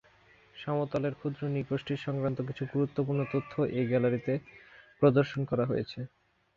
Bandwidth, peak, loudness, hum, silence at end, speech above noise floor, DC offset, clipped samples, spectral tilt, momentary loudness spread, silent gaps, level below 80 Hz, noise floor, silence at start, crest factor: 7 kHz; -10 dBFS; -31 LUFS; none; 0.5 s; 31 dB; under 0.1%; under 0.1%; -9 dB/octave; 9 LU; none; -64 dBFS; -61 dBFS; 0.55 s; 20 dB